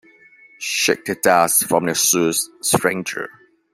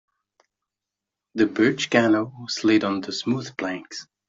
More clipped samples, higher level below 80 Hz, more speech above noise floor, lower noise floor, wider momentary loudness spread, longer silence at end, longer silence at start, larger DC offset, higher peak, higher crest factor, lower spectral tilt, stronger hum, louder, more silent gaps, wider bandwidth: neither; first, -60 dBFS vs -66 dBFS; second, 30 dB vs 64 dB; second, -49 dBFS vs -87 dBFS; about the same, 13 LU vs 11 LU; first, 0.45 s vs 0.25 s; second, 0.6 s vs 1.35 s; neither; about the same, -2 dBFS vs -4 dBFS; about the same, 18 dB vs 20 dB; second, -2.5 dB/octave vs -4.5 dB/octave; neither; first, -17 LUFS vs -23 LUFS; neither; first, 16 kHz vs 7.8 kHz